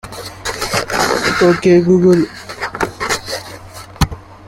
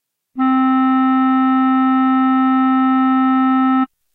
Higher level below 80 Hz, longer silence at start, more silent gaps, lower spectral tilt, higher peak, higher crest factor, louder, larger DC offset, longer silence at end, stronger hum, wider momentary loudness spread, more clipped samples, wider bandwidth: first, -36 dBFS vs -72 dBFS; second, 0.05 s vs 0.35 s; neither; second, -5 dB/octave vs -7 dB/octave; first, 0 dBFS vs -6 dBFS; first, 14 dB vs 8 dB; about the same, -15 LUFS vs -14 LUFS; neither; second, 0 s vs 0.3 s; neither; first, 15 LU vs 2 LU; neither; first, 16.5 kHz vs 3.9 kHz